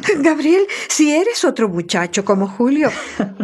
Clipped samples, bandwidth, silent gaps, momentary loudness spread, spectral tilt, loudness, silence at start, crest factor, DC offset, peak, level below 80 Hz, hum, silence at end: under 0.1%; 13 kHz; none; 5 LU; -4 dB/octave; -16 LUFS; 0 s; 14 dB; under 0.1%; 0 dBFS; -60 dBFS; none; 0 s